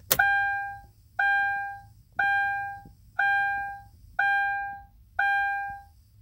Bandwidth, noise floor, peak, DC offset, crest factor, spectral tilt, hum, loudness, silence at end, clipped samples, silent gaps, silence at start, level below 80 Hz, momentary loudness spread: 16 kHz; -46 dBFS; -4 dBFS; under 0.1%; 24 dB; -1 dB/octave; none; -26 LUFS; 0.35 s; under 0.1%; none; 0.1 s; -56 dBFS; 16 LU